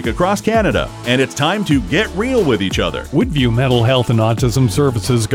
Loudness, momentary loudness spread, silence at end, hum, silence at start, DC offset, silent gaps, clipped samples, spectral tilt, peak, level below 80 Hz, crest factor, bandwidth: -15 LUFS; 4 LU; 0 s; none; 0 s; under 0.1%; none; under 0.1%; -5.5 dB/octave; -2 dBFS; -30 dBFS; 12 dB; 16.5 kHz